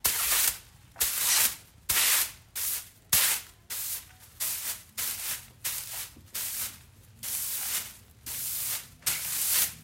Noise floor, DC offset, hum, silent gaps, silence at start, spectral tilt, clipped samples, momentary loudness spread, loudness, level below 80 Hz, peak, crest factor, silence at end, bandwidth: -53 dBFS; under 0.1%; none; none; 0.05 s; 1.5 dB/octave; under 0.1%; 14 LU; -28 LUFS; -58 dBFS; -8 dBFS; 24 dB; 0 s; 16 kHz